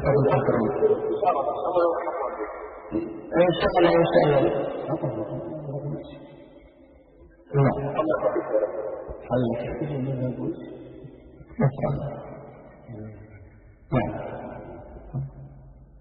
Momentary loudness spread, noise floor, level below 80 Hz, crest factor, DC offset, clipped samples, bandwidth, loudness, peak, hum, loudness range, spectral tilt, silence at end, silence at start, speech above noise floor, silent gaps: 21 LU; -52 dBFS; -48 dBFS; 20 dB; under 0.1%; under 0.1%; 5.2 kHz; -25 LUFS; -6 dBFS; none; 10 LU; -11.5 dB/octave; 0 s; 0 s; 29 dB; none